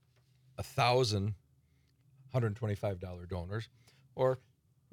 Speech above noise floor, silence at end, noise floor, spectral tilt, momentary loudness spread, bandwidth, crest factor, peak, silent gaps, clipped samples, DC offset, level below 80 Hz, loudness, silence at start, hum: 36 dB; 0.55 s; -70 dBFS; -5.5 dB/octave; 19 LU; 16 kHz; 20 dB; -16 dBFS; none; under 0.1%; under 0.1%; -66 dBFS; -34 LUFS; 0.6 s; none